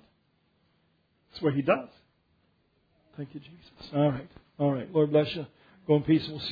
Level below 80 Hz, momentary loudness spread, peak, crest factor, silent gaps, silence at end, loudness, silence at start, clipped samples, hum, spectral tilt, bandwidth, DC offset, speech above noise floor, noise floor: -64 dBFS; 22 LU; -10 dBFS; 20 dB; none; 0 s; -28 LUFS; 1.35 s; under 0.1%; none; -9 dB/octave; 5 kHz; under 0.1%; 43 dB; -70 dBFS